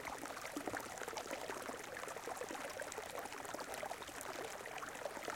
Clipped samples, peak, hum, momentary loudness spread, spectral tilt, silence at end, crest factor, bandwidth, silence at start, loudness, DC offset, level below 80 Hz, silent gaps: under 0.1%; -26 dBFS; none; 2 LU; -2 dB/octave; 0 s; 20 dB; 17 kHz; 0 s; -46 LUFS; under 0.1%; -74 dBFS; none